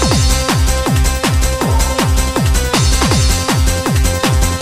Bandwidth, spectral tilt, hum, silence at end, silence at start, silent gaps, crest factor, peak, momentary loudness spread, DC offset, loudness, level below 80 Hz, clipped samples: 16 kHz; -4 dB/octave; none; 0 s; 0 s; none; 12 dB; 0 dBFS; 2 LU; under 0.1%; -14 LUFS; -16 dBFS; under 0.1%